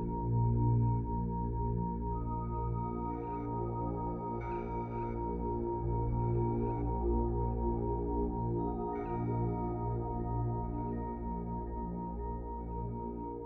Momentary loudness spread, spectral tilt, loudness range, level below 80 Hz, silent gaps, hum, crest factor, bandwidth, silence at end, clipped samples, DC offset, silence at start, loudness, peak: 7 LU; -12.5 dB/octave; 3 LU; -40 dBFS; none; 60 Hz at -55 dBFS; 14 dB; 2.7 kHz; 0 s; under 0.1%; under 0.1%; 0 s; -36 LUFS; -20 dBFS